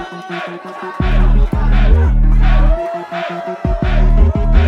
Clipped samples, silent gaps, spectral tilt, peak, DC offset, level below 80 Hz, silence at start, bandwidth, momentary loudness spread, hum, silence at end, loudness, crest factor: under 0.1%; none; -8.5 dB/octave; 0 dBFS; under 0.1%; -12 dBFS; 0 s; 5 kHz; 11 LU; none; 0 s; -16 LUFS; 12 dB